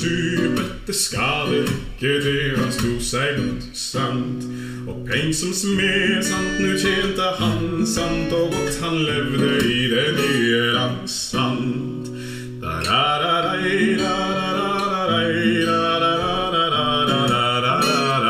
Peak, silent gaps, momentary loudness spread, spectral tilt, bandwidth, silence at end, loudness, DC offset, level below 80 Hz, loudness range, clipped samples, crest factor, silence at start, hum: -4 dBFS; none; 7 LU; -4 dB/octave; 16 kHz; 0 s; -20 LUFS; under 0.1%; -42 dBFS; 3 LU; under 0.1%; 16 dB; 0 s; none